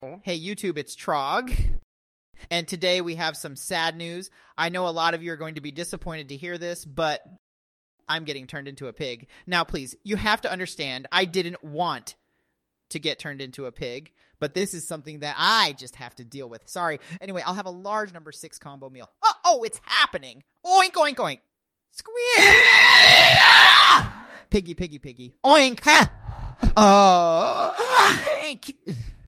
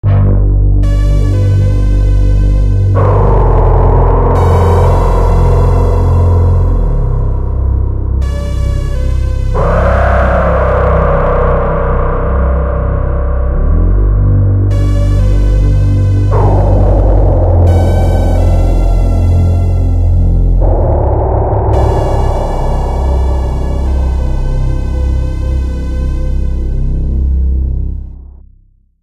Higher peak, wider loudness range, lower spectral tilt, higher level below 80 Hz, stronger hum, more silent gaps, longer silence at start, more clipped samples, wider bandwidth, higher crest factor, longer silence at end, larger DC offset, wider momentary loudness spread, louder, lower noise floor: about the same, 0 dBFS vs 0 dBFS; first, 20 LU vs 6 LU; second, -2.5 dB/octave vs -9 dB/octave; second, -40 dBFS vs -12 dBFS; neither; first, 1.83-2.33 s, 7.39-7.98 s vs none; about the same, 0 s vs 0.05 s; neither; first, 16.5 kHz vs 7.8 kHz; first, 22 dB vs 8 dB; second, 0.15 s vs 0.8 s; neither; first, 24 LU vs 6 LU; second, -18 LUFS vs -12 LUFS; first, -76 dBFS vs -46 dBFS